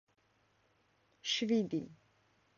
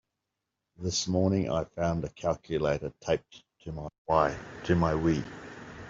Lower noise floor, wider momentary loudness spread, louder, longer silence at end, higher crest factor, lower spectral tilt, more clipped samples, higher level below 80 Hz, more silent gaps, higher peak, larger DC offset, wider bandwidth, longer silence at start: second, -74 dBFS vs -85 dBFS; about the same, 12 LU vs 14 LU; second, -35 LUFS vs -30 LUFS; first, 0.65 s vs 0 s; about the same, 18 dB vs 20 dB; second, -3.5 dB/octave vs -5.5 dB/octave; neither; second, -78 dBFS vs -52 dBFS; second, none vs 3.98-4.05 s; second, -22 dBFS vs -10 dBFS; neither; about the same, 7.4 kHz vs 7.8 kHz; first, 1.25 s vs 0.8 s